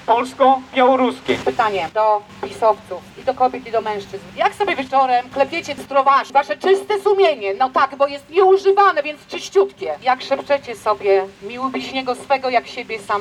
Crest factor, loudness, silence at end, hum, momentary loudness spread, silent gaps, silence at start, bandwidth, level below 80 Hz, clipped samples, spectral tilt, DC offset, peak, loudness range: 16 dB; -18 LUFS; 0 s; none; 10 LU; none; 0 s; 12 kHz; -58 dBFS; under 0.1%; -4 dB/octave; under 0.1%; -2 dBFS; 4 LU